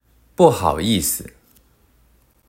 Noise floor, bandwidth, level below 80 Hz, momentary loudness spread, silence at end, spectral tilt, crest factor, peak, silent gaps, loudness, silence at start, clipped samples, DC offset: -57 dBFS; 16.5 kHz; -46 dBFS; 11 LU; 1.2 s; -4.5 dB/octave; 20 dB; 0 dBFS; none; -18 LUFS; 0.4 s; under 0.1%; under 0.1%